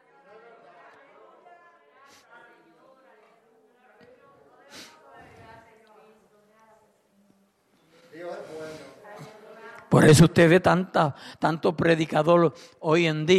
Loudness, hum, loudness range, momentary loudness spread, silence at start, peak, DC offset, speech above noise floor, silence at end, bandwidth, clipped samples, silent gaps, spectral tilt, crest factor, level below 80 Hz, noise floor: -21 LUFS; none; 24 LU; 29 LU; 4.75 s; -6 dBFS; under 0.1%; 45 dB; 0 s; 13.5 kHz; under 0.1%; none; -6 dB/octave; 20 dB; -54 dBFS; -65 dBFS